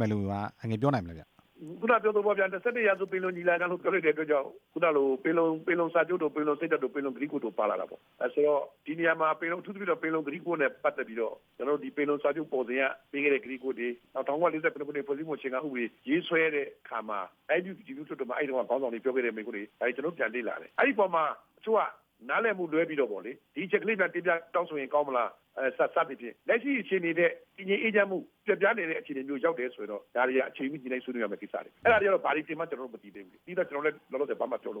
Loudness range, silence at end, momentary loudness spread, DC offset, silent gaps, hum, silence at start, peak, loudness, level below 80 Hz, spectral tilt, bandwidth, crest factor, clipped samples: 3 LU; 0 s; 10 LU; under 0.1%; none; none; 0 s; -12 dBFS; -30 LUFS; -72 dBFS; -8 dB/octave; 6.4 kHz; 18 dB; under 0.1%